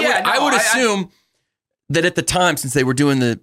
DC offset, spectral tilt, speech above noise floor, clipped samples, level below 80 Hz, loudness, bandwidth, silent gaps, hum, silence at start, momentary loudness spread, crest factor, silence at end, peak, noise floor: under 0.1%; -3.5 dB/octave; 59 dB; under 0.1%; -48 dBFS; -16 LUFS; 16.5 kHz; none; none; 0 s; 6 LU; 14 dB; 0.05 s; -4 dBFS; -76 dBFS